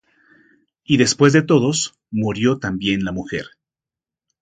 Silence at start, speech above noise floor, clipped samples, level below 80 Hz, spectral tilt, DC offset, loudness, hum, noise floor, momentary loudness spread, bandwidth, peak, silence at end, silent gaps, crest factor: 0.9 s; 71 dB; under 0.1%; -50 dBFS; -5 dB/octave; under 0.1%; -18 LUFS; none; -89 dBFS; 13 LU; 9.6 kHz; 0 dBFS; 0.95 s; none; 20 dB